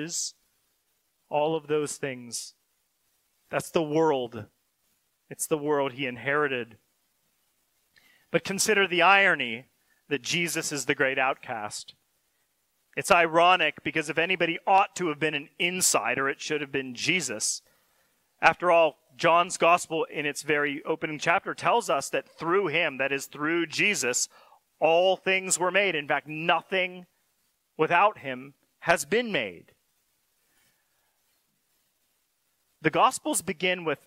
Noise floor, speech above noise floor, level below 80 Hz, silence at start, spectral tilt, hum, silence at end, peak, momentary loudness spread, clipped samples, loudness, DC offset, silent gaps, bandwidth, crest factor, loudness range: -74 dBFS; 48 dB; -70 dBFS; 0 s; -2.5 dB/octave; none; 0.1 s; -6 dBFS; 12 LU; under 0.1%; -25 LUFS; under 0.1%; none; 16 kHz; 22 dB; 7 LU